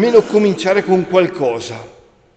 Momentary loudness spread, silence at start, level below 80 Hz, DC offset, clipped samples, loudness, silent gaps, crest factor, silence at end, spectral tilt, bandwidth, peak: 14 LU; 0 s; -54 dBFS; under 0.1%; under 0.1%; -15 LUFS; none; 14 dB; 0.45 s; -6 dB/octave; 8.6 kHz; 0 dBFS